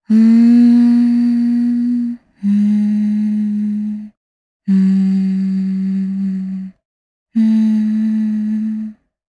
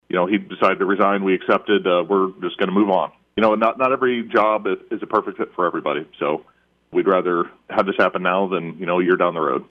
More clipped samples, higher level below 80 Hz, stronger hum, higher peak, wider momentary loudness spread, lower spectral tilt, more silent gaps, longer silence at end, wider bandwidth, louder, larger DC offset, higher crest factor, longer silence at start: neither; about the same, -60 dBFS vs -62 dBFS; neither; about the same, -4 dBFS vs -4 dBFS; first, 14 LU vs 7 LU; about the same, -9 dB/octave vs -8 dB/octave; first, 4.17-4.60 s, 6.85-7.26 s vs none; first, 0.35 s vs 0.05 s; second, 5 kHz vs 6 kHz; first, -15 LUFS vs -20 LUFS; neither; second, 10 dB vs 16 dB; about the same, 0.1 s vs 0.15 s